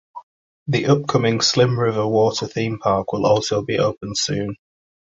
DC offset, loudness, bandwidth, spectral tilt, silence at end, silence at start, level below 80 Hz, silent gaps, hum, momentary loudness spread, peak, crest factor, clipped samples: under 0.1%; -19 LUFS; 8.2 kHz; -5 dB/octave; 0.6 s; 0.15 s; -52 dBFS; 0.23-0.66 s; none; 7 LU; -2 dBFS; 18 dB; under 0.1%